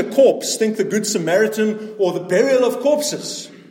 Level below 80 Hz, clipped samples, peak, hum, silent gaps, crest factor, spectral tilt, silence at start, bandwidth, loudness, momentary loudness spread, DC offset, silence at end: -72 dBFS; under 0.1%; -2 dBFS; none; none; 14 dB; -4 dB/octave; 0 s; 17 kHz; -18 LUFS; 8 LU; under 0.1%; 0.15 s